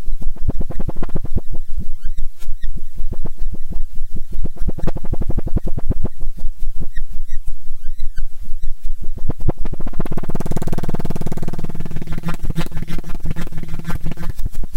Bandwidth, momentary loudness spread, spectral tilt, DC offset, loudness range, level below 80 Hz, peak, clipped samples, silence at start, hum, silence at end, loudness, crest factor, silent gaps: 2.5 kHz; 7 LU; -7.5 dB/octave; under 0.1%; 4 LU; -20 dBFS; -2 dBFS; under 0.1%; 0 s; none; 0 s; -28 LUFS; 8 dB; none